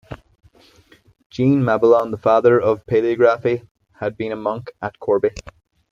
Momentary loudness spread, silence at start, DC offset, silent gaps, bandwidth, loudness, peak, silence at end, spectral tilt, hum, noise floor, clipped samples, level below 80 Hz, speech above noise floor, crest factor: 15 LU; 0.1 s; under 0.1%; 1.26-1.30 s, 3.71-3.75 s; 7.6 kHz; -18 LUFS; -2 dBFS; 0.5 s; -8 dB/octave; none; -53 dBFS; under 0.1%; -52 dBFS; 35 dB; 18 dB